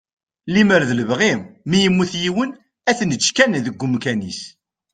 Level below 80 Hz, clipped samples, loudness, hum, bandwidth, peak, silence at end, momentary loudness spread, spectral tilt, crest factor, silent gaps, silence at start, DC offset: -56 dBFS; under 0.1%; -18 LUFS; none; 9.4 kHz; 0 dBFS; 0.45 s; 11 LU; -4.5 dB/octave; 18 dB; none; 0.45 s; under 0.1%